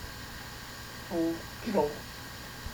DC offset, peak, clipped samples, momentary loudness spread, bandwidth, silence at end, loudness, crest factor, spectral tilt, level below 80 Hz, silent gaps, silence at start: under 0.1%; -14 dBFS; under 0.1%; 12 LU; over 20 kHz; 0 s; -35 LUFS; 22 dB; -5 dB/octave; -52 dBFS; none; 0 s